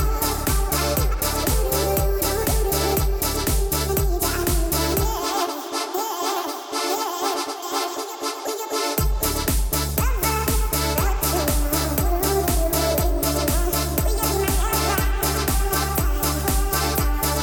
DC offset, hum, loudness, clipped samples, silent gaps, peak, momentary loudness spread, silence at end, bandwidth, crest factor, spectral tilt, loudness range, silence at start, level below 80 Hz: under 0.1%; none; -22 LUFS; under 0.1%; none; -8 dBFS; 5 LU; 0 s; 19 kHz; 14 dB; -4 dB/octave; 3 LU; 0 s; -26 dBFS